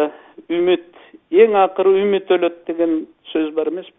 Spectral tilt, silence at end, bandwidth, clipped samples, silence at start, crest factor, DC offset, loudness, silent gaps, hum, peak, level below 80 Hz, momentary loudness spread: -10 dB/octave; 0.15 s; 3.9 kHz; under 0.1%; 0 s; 18 dB; under 0.1%; -17 LUFS; none; none; 0 dBFS; -66 dBFS; 10 LU